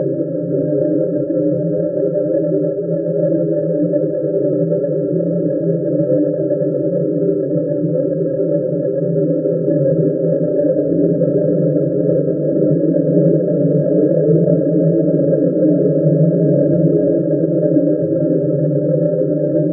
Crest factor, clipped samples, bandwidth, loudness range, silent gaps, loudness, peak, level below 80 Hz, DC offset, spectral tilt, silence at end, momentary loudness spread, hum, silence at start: 14 dB; under 0.1%; 1.9 kHz; 3 LU; none; -16 LUFS; -2 dBFS; -58 dBFS; under 0.1%; -17.5 dB/octave; 0 s; 4 LU; none; 0 s